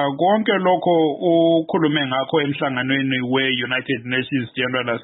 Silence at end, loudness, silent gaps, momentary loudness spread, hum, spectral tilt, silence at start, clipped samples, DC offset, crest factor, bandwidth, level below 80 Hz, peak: 0 s; -19 LUFS; none; 5 LU; none; -11 dB/octave; 0 s; under 0.1%; under 0.1%; 14 dB; 4.1 kHz; -66 dBFS; -6 dBFS